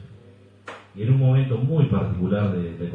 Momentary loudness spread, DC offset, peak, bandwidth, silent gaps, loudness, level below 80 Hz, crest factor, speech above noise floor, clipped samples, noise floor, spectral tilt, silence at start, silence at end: 20 LU; under 0.1%; -8 dBFS; 4 kHz; none; -22 LUFS; -48 dBFS; 14 dB; 29 dB; under 0.1%; -50 dBFS; -10.5 dB/octave; 0 s; 0 s